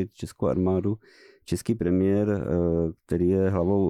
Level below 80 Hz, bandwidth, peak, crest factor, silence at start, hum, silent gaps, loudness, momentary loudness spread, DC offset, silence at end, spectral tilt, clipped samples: -46 dBFS; 14 kHz; -14 dBFS; 12 dB; 0 s; none; none; -25 LUFS; 8 LU; under 0.1%; 0 s; -8.5 dB/octave; under 0.1%